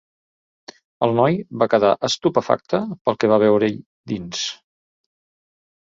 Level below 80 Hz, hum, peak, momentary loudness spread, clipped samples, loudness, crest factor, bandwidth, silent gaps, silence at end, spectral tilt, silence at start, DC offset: -60 dBFS; none; -2 dBFS; 12 LU; under 0.1%; -20 LUFS; 20 dB; 7.8 kHz; 3.01-3.05 s, 3.86-4.04 s; 1.3 s; -5 dB/octave; 1 s; under 0.1%